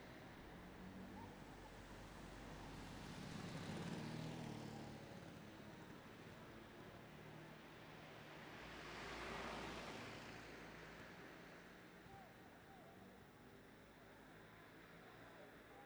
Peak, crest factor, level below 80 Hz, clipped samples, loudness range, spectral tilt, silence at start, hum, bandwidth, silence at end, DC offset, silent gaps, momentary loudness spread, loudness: -38 dBFS; 18 dB; -70 dBFS; under 0.1%; 9 LU; -5 dB/octave; 0 s; none; over 20 kHz; 0 s; under 0.1%; none; 12 LU; -56 LUFS